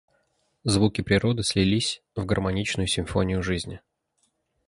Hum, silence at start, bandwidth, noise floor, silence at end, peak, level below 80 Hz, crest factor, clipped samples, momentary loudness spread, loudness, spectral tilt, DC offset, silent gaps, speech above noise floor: none; 0.65 s; 11.5 kHz; -72 dBFS; 0.9 s; -6 dBFS; -42 dBFS; 20 dB; under 0.1%; 9 LU; -25 LUFS; -5 dB/octave; under 0.1%; none; 48 dB